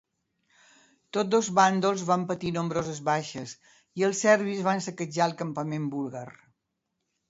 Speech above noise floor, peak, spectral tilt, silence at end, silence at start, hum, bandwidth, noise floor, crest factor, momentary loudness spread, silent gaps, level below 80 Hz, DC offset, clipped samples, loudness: 54 dB; -6 dBFS; -5 dB/octave; 1 s; 1.15 s; none; 8 kHz; -81 dBFS; 22 dB; 15 LU; none; -68 dBFS; under 0.1%; under 0.1%; -27 LUFS